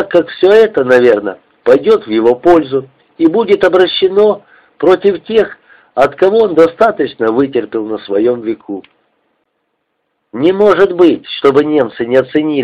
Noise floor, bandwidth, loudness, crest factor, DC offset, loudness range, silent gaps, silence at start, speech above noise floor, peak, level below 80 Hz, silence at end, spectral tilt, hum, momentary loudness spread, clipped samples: -67 dBFS; 8.4 kHz; -11 LUFS; 12 dB; under 0.1%; 5 LU; none; 0 s; 56 dB; 0 dBFS; -50 dBFS; 0 s; -6.5 dB/octave; none; 11 LU; under 0.1%